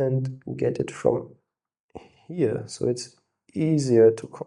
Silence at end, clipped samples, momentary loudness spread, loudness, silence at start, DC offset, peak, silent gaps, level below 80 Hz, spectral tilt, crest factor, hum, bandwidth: 0.05 s; under 0.1%; 14 LU; -24 LUFS; 0 s; under 0.1%; -6 dBFS; 1.80-1.89 s; -62 dBFS; -7 dB/octave; 18 dB; none; 11.5 kHz